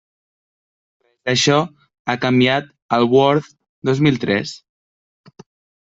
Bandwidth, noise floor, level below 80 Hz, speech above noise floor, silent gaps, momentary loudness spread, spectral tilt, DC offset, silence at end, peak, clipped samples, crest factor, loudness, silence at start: 8 kHz; under -90 dBFS; -58 dBFS; over 74 dB; 1.99-2.05 s, 2.82-2.89 s, 3.69-3.82 s; 14 LU; -5 dB/octave; under 0.1%; 1.25 s; -2 dBFS; under 0.1%; 18 dB; -17 LUFS; 1.25 s